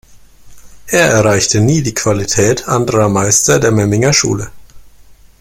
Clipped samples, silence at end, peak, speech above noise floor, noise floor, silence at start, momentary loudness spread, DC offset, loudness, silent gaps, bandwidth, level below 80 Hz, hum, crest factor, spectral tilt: under 0.1%; 0.3 s; 0 dBFS; 29 dB; -40 dBFS; 0.1 s; 6 LU; under 0.1%; -11 LUFS; none; 16.5 kHz; -40 dBFS; none; 14 dB; -4 dB/octave